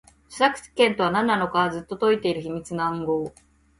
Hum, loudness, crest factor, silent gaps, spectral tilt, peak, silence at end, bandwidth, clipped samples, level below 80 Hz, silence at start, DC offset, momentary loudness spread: none; -23 LUFS; 20 dB; none; -5 dB/octave; -4 dBFS; 0.5 s; 11.5 kHz; under 0.1%; -58 dBFS; 0.3 s; under 0.1%; 9 LU